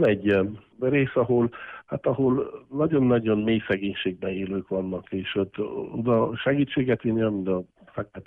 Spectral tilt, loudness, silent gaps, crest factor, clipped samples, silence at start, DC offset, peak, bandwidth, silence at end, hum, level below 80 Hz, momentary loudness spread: -9.5 dB/octave; -25 LUFS; none; 14 dB; under 0.1%; 0 s; under 0.1%; -10 dBFS; 4.5 kHz; 0.05 s; none; -56 dBFS; 9 LU